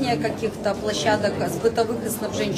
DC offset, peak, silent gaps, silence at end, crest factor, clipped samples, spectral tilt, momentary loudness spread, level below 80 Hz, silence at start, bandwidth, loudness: under 0.1%; -6 dBFS; none; 0 s; 16 dB; under 0.1%; -4.5 dB/octave; 5 LU; -50 dBFS; 0 s; 14 kHz; -24 LUFS